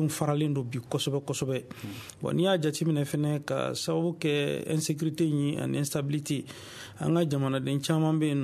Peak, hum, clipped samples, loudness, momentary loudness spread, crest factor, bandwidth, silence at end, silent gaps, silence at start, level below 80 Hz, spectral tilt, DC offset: -12 dBFS; none; under 0.1%; -29 LUFS; 8 LU; 16 dB; 14 kHz; 0 s; none; 0 s; -64 dBFS; -5.5 dB/octave; under 0.1%